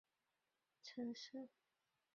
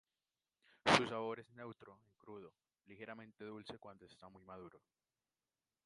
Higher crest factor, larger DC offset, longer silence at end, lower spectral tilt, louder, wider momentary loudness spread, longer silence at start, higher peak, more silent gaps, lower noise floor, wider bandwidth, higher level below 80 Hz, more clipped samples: second, 18 dB vs 34 dB; neither; second, 0.7 s vs 1.1 s; about the same, -3 dB/octave vs -3.5 dB/octave; second, -53 LUFS vs -38 LUFS; second, 12 LU vs 27 LU; about the same, 0.85 s vs 0.85 s; second, -38 dBFS vs -10 dBFS; neither; about the same, -90 dBFS vs under -90 dBFS; second, 7.4 kHz vs 11 kHz; second, under -90 dBFS vs -76 dBFS; neither